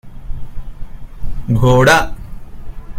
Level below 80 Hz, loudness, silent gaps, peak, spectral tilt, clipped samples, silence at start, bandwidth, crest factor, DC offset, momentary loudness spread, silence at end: -26 dBFS; -12 LUFS; none; 0 dBFS; -5.5 dB/octave; under 0.1%; 0.05 s; 16 kHz; 16 dB; under 0.1%; 26 LU; 0 s